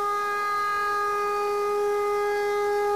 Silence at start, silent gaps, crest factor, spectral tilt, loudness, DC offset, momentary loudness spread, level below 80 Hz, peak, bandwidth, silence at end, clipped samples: 0 s; none; 6 dB; -2.5 dB/octave; -25 LUFS; 0.2%; 1 LU; -62 dBFS; -18 dBFS; 15.5 kHz; 0 s; under 0.1%